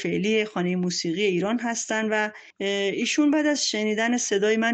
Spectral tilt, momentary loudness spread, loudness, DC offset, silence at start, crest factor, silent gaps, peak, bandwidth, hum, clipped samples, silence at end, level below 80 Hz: -3.5 dB/octave; 5 LU; -24 LUFS; under 0.1%; 0 s; 14 dB; none; -10 dBFS; 9 kHz; none; under 0.1%; 0 s; -70 dBFS